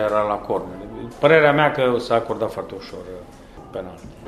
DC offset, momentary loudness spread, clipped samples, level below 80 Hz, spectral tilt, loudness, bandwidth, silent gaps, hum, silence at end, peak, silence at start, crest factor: under 0.1%; 21 LU; under 0.1%; -48 dBFS; -6.5 dB/octave; -19 LUFS; 13.5 kHz; none; none; 0 s; 0 dBFS; 0 s; 20 dB